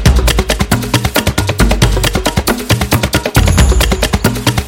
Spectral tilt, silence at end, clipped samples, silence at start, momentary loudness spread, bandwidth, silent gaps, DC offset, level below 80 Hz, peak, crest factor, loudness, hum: -4.5 dB/octave; 0 s; under 0.1%; 0 s; 4 LU; 17.5 kHz; none; under 0.1%; -16 dBFS; 0 dBFS; 12 dB; -12 LUFS; none